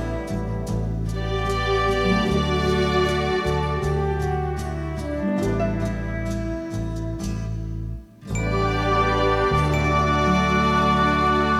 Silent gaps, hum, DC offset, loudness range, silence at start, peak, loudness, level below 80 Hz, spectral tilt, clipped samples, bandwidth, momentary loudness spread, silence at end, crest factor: none; none; under 0.1%; 6 LU; 0 s; -8 dBFS; -23 LUFS; -32 dBFS; -6 dB/octave; under 0.1%; 14.5 kHz; 10 LU; 0 s; 14 dB